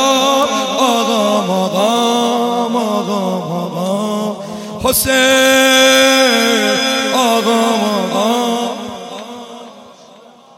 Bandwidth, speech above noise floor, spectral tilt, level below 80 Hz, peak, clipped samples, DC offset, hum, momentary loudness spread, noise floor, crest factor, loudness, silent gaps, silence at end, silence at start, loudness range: 17 kHz; 30 dB; -3 dB/octave; -48 dBFS; 0 dBFS; under 0.1%; under 0.1%; none; 17 LU; -41 dBFS; 14 dB; -13 LUFS; none; 0.65 s; 0 s; 6 LU